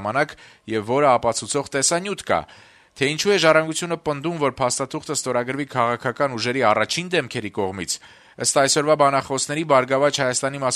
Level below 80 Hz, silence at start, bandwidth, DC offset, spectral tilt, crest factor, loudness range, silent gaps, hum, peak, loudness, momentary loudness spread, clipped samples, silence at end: -58 dBFS; 0 s; 13.5 kHz; under 0.1%; -3 dB/octave; 20 dB; 2 LU; none; none; -2 dBFS; -21 LUFS; 9 LU; under 0.1%; 0 s